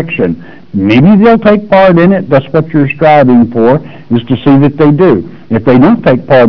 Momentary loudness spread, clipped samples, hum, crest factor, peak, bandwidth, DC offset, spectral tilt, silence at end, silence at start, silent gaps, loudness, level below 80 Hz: 9 LU; under 0.1%; none; 6 dB; 0 dBFS; 5.4 kHz; 3%; -10 dB/octave; 0 s; 0 s; none; -7 LUFS; -38 dBFS